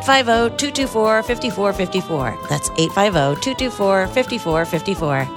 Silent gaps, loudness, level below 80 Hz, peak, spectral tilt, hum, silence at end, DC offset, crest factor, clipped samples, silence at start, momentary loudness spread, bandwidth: none; -18 LUFS; -40 dBFS; 0 dBFS; -4 dB/octave; none; 0 s; under 0.1%; 18 dB; under 0.1%; 0 s; 6 LU; 19 kHz